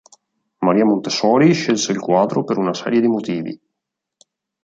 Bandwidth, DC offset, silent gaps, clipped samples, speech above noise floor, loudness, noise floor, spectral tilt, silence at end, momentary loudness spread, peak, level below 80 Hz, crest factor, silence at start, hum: 8 kHz; under 0.1%; none; under 0.1%; 64 dB; -17 LUFS; -80 dBFS; -5.5 dB/octave; 1.05 s; 10 LU; -2 dBFS; -64 dBFS; 16 dB; 0.6 s; none